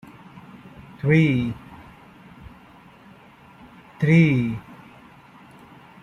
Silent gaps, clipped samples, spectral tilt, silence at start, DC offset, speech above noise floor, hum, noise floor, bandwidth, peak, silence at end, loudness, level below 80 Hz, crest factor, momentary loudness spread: none; under 0.1%; -8.5 dB/octave; 0.35 s; under 0.1%; 30 dB; none; -49 dBFS; 6.8 kHz; -4 dBFS; 1.3 s; -20 LUFS; -54 dBFS; 20 dB; 28 LU